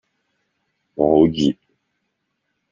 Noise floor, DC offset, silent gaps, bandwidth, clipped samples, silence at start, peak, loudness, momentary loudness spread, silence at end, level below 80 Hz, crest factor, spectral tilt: -74 dBFS; under 0.1%; none; 7.4 kHz; under 0.1%; 1 s; -2 dBFS; -17 LUFS; 19 LU; 1.2 s; -50 dBFS; 20 dB; -7.5 dB/octave